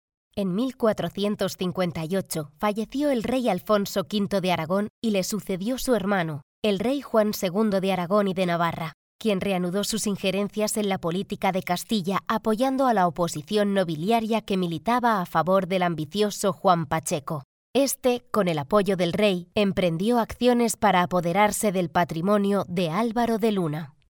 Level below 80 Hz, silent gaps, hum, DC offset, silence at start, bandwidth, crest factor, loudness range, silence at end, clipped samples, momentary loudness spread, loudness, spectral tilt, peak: -54 dBFS; 4.90-5.02 s, 6.43-6.62 s, 8.94-9.19 s, 17.45-17.74 s; none; under 0.1%; 0.35 s; over 20 kHz; 18 dB; 3 LU; 0.2 s; under 0.1%; 6 LU; -25 LUFS; -5 dB/octave; -6 dBFS